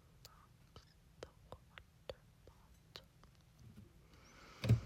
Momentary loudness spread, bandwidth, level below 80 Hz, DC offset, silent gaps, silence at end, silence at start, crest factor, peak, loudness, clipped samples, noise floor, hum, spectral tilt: 11 LU; 15 kHz; -60 dBFS; under 0.1%; none; 0 s; 0.75 s; 26 dB; -20 dBFS; -50 LUFS; under 0.1%; -66 dBFS; none; -7 dB/octave